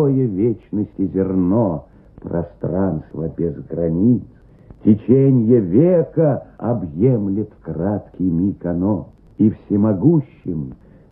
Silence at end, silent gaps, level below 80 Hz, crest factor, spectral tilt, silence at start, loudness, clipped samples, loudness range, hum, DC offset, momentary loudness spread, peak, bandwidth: 0.35 s; none; -44 dBFS; 16 dB; -14.5 dB/octave; 0 s; -18 LUFS; under 0.1%; 5 LU; none; under 0.1%; 12 LU; -2 dBFS; 3.2 kHz